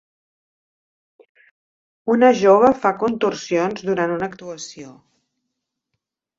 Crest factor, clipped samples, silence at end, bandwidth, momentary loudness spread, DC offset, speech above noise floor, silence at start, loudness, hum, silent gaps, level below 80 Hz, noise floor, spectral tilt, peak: 20 dB; under 0.1%; 1.5 s; 7.8 kHz; 19 LU; under 0.1%; 61 dB; 2.05 s; -18 LUFS; none; none; -62 dBFS; -79 dBFS; -5.5 dB/octave; -2 dBFS